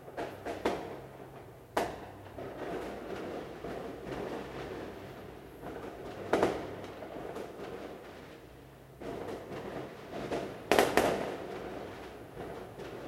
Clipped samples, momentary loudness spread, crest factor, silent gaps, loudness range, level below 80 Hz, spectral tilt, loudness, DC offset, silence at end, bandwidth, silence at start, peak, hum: under 0.1%; 17 LU; 32 dB; none; 9 LU; -58 dBFS; -4.5 dB/octave; -37 LUFS; under 0.1%; 0 s; 16 kHz; 0 s; -4 dBFS; none